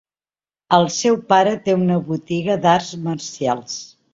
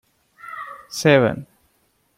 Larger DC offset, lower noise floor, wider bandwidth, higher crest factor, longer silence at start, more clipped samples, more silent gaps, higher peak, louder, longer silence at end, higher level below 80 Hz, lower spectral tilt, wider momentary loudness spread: neither; first, under -90 dBFS vs -65 dBFS; second, 7.8 kHz vs 16.5 kHz; about the same, 18 dB vs 20 dB; first, 0.7 s vs 0.45 s; neither; neither; about the same, -2 dBFS vs -2 dBFS; about the same, -18 LUFS vs -18 LUFS; second, 0.25 s vs 0.75 s; about the same, -58 dBFS vs -58 dBFS; about the same, -5 dB/octave vs -5.5 dB/octave; second, 10 LU vs 19 LU